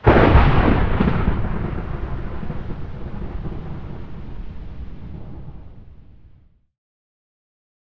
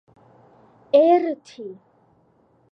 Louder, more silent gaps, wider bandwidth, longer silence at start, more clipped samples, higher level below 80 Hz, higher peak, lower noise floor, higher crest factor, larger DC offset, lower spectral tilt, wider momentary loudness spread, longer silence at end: second, -21 LUFS vs -18 LUFS; neither; second, 5.8 kHz vs 8 kHz; second, 0 s vs 0.95 s; neither; first, -26 dBFS vs -76 dBFS; first, 0 dBFS vs -4 dBFS; second, -52 dBFS vs -60 dBFS; about the same, 20 dB vs 20 dB; neither; first, -9.5 dB/octave vs -6 dB/octave; about the same, 22 LU vs 23 LU; first, 1.7 s vs 1 s